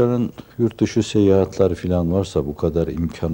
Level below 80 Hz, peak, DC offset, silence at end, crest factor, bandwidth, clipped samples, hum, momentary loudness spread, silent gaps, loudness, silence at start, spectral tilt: -42 dBFS; -2 dBFS; under 0.1%; 0 s; 16 dB; 16.5 kHz; under 0.1%; none; 7 LU; none; -20 LUFS; 0 s; -7.5 dB/octave